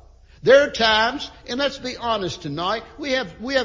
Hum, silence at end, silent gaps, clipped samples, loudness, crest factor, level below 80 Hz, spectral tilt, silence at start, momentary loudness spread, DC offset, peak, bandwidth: none; 0 s; none; under 0.1%; -21 LUFS; 20 dB; -48 dBFS; -3.5 dB/octave; 0.45 s; 13 LU; under 0.1%; -2 dBFS; 7.6 kHz